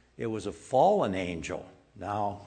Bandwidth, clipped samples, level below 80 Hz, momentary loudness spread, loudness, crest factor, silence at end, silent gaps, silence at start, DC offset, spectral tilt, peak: 9.4 kHz; under 0.1%; -58 dBFS; 14 LU; -29 LUFS; 18 dB; 0 s; none; 0.2 s; under 0.1%; -6 dB/octave; -12 dBFS